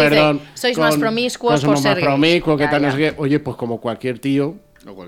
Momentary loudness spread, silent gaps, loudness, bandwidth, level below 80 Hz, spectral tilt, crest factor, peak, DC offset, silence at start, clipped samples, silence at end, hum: 9 LU; none; -17 LUFS; 16 kHz; -50 dBFS; -5.5 dB/octave; 16 dB; -2 dBFS; under 0.1%; 0 s; under 0.1%; 0 s; none